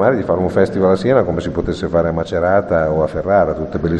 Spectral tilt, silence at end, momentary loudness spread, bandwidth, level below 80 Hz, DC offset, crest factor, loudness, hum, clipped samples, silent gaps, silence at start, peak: -8 dB/octave; 0 s; 5 LU; 9.6 kHz; -36 dBFS; under 0.1%; 14 dB; -16 LUFS; none; under 0.1%; none; 0 s; 0 dBFS